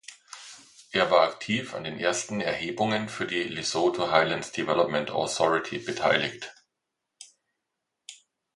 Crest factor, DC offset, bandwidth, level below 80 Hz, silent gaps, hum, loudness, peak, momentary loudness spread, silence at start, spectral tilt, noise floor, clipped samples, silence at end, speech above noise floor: 24 dB; under 0.1%; 11.5 kHz; -64 dBFS; none; none; -26 LUFS; -4 dBFS; 20 LU; 0.1 s; -3.5 dB/octave; -84 dBFS; under 0.1%; 0.4 s; 57 dB